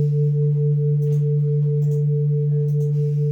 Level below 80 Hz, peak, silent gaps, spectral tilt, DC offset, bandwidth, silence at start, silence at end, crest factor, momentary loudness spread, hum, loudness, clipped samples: -68 dBFS; -12 dBFS; none; -12 dB/octave; under 0.1%; 0.9 kHz; 0 s; 0 s; 6 dB; 1 LU; none; -20 LUFS; under 0.1%